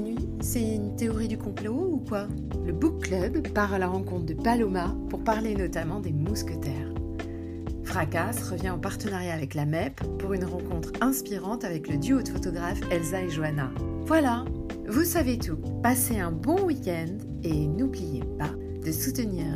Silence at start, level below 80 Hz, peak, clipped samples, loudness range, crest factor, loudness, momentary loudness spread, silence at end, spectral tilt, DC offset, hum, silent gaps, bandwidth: 0 s; -40 dBFS; -10 dBFS; under 0.1%; 4 LU; 18 dB; -29 LUFS; 8 LU; 0 s; -6 dB/octave; under 0.1%; none; none; 15.5 kHz